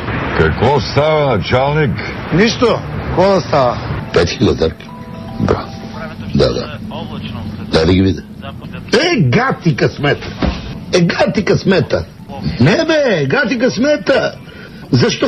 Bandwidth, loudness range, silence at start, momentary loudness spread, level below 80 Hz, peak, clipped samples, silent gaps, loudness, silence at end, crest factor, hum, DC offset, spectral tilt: 10.5 kHz; 4 LU; 0 s; 14 LU; -32 dBFS; -2 dBFS; under 0.1%; none; -14 LUFS; 0 s; 12 dB; none; 0.2%; -6 dB/octave